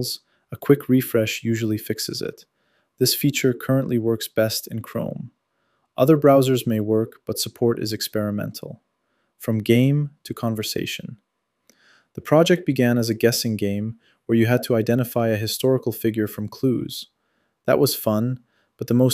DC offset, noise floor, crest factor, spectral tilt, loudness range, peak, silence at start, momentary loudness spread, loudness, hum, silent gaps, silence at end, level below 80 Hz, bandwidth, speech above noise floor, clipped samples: under 0.1%; -71 dBFS; 20 dB; -5.5 dB/octave; 4 LU; -2 dBFS; 0 s; 15 LU; -21 LUFS; none; none; 0 s; -62 dBFS; 16 kHz; 50 dB; under 0.1%